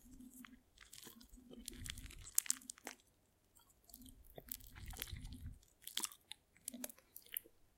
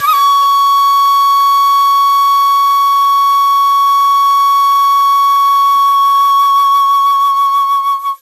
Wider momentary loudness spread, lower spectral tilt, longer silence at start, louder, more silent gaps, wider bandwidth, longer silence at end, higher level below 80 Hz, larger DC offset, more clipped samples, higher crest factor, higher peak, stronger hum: first, 19 LU vs 1 LU; first, -1.5 dB/octave vs 3 dB/octave; about the same, 0 s vs 0 s; second, -46 LUFS vs -9 LUFS; neither; about the same, 17 kHz vs 15.5 kHz; about the same, 0.1 s vs 0.05 s; first, -62 dBFS vs -72 dBFS; neither; neither; first, 42 dB vs 6 dB; second, -8 dBFS vs -2 dBFS; neither